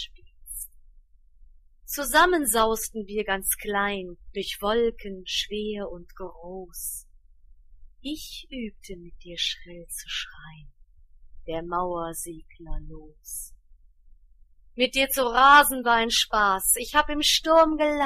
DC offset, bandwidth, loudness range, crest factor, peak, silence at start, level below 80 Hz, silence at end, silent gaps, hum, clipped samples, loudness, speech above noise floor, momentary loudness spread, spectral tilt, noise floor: under 0.1%; 15.5 kHz; 15 LU; 22 dB; -4 dBFS; 0 s; -44 dBFS; 0 s; none; none; under 0.1%; -23 LUFS; 29 dB; 21 LU; -1.5 dB/octave; -54 dBFS